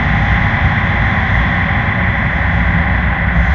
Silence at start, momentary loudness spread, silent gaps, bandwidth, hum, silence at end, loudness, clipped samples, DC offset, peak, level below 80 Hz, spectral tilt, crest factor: 0 s; 1 LU; none; 6.6 kHz; none; 0 s; -13 LUFS; under 0.1%; under 0.1%; 0 dBFS; -18 dBFS; -8 dB/octave; 12 dB